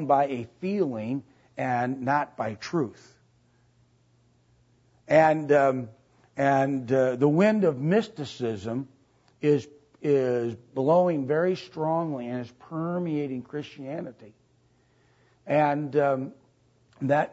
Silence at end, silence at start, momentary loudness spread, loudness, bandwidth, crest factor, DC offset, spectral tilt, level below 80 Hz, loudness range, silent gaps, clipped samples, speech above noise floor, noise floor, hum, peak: 0 s; 0 s; 15 LU; -26 LUFS; 8 kHz; 20 dB; under 0.1%; -7.5 dB/octave; -70 dBFS; 8 LU; none; under 0.1%; 39 dB; -64 dBFS; none; -6 dBFS